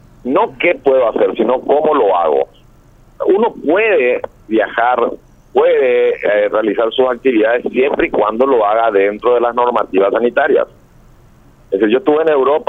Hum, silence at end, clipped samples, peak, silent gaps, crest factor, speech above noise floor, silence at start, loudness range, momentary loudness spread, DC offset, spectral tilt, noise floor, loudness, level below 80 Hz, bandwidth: none; 0.05 s; under 0.1%; 0 dBFS; none; 14 dB; 32 dB; 0.25 s; 2 LU; 5 LU; under 0.1%; -7 dB/octave; -45 dBFS; -13 LUFS; -48 dBFS; 4 kHz